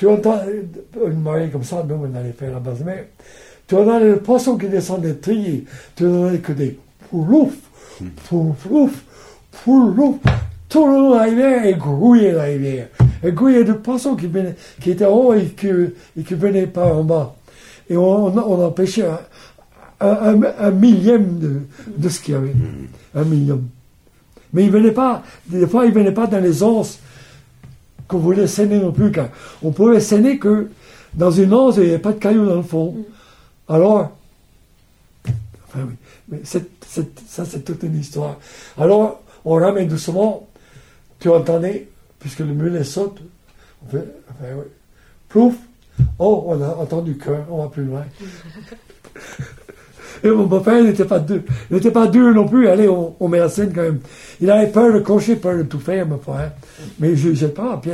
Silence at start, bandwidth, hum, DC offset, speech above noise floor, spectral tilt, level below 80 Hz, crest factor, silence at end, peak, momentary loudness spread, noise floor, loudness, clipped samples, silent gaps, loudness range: 0 s; 13 kHz; none; under 0.1%; 37 dB; -8 dB/octave; -42 dBFS; 14 dB; 0 s; -2 dBFS; 17 LU; -52 dBFS; -16 LUFS; under 0.1%; none; 8 LU